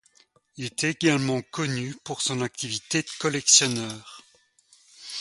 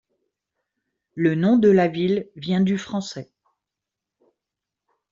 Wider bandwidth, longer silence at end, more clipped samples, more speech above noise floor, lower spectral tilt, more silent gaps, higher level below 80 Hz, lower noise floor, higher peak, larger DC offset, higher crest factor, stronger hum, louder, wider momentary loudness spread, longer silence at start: first, 11.5 kHz vs 7.6 kHz; second, 0 s vs 1.9 s; neither; second, 36 dB vs 66 dB; second, -2.5 dB/octave vs -7 dB/octave; neither; about the same, -66 dBFS vs -64 dBFS; second, -62 dBFS vs -86 dBFS; about the same, -4 dBFS vs -6 dBFS; neither; first, 24 dB vs 18 dB; neither; second, -24 LUFS vs -21 LUFS; about the same, 19 LU vs 17 LU; second, 0.55 s vs 1.15 s